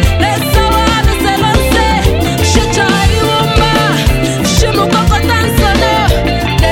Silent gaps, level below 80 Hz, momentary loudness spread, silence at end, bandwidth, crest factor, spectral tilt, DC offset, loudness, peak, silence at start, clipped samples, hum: none; -16 dBFS; 2 LU; 0 s; 17 kHz; 10 dB; -4.5 dB/octave; under 0.1%; -10 LUFS; 0 dBFS; 0 s; under 0.1%; none